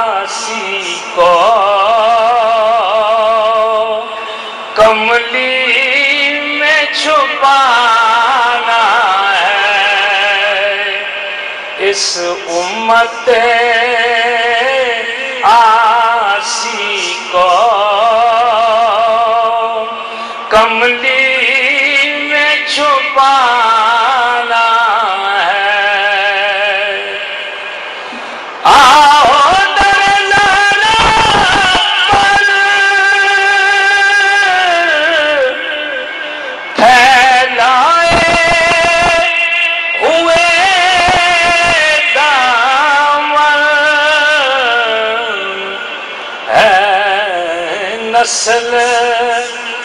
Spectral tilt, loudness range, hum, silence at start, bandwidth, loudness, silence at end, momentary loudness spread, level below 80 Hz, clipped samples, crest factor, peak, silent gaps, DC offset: -1.5 dB/octave; 4 LU; none; 0 s; 14 kHz; -9 LUFS; 0 s; 9 LU; -40 dBFS; under 0.1%; 10 dB; 0 dBFS; none; under 0.1%